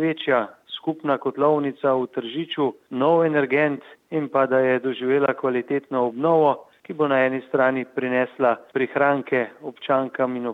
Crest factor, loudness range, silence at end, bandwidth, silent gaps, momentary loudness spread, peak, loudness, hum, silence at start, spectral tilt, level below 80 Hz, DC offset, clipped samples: 16 dB; 1 LU; 0 s; 4.7 kHz; none; 9 LU; -6 dBFS; -22 LUFS; none; 0 s; -8 dB/octave; -76 dBFS; under 0.1%; under 0.1%